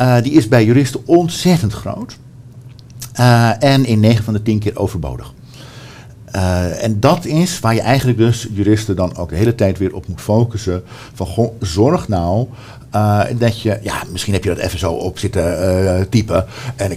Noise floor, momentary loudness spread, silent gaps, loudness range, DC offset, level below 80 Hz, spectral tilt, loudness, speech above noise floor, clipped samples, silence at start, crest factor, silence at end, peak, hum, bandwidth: -36 dBFS; 14 LU; none; 3 LU; under 0.1%; -38 dBFS; -6.5 dB/octave; -15 LUFS; 22 dB; under 0.1%; 0 s; 14 dB; 0 s; 0 dBFS; none; 16 kHz